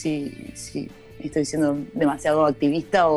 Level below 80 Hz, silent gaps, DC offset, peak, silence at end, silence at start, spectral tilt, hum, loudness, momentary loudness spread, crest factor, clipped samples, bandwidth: -52 dBFS; none; under 0.1%; -6 dBFS; 0 s; 0 s; -5.5 dB/octave; none; -23 LUFS; 15 LU; 18 dB; under 0.1%; 12.5 kHz